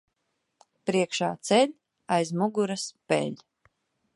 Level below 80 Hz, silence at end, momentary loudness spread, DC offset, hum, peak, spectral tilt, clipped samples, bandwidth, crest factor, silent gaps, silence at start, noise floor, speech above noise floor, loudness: -76 dBFS; 0.8 s; 11 LU; under 0.1%; none; -8 dBFS; -4.5 dB/octave; under 0.1%; 11.5 kHz; 20 dB; none; 0.85 s; -78 dBFS; 52 dB; -27 LUFS